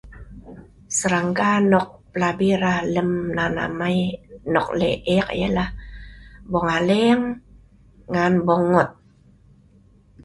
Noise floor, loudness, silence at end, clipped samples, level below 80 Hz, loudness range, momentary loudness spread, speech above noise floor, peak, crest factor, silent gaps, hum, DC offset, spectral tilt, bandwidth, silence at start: -53 dBFS; -21 LUFS; 1.3 s; under 0.1%; -44 dBFS; 2 LU; 11 LU; 33 dB; -2 dBFS; 20 dB; none; none; under 0.1%; -5.5 dB/octave; 11.5 kHz; 0.05 s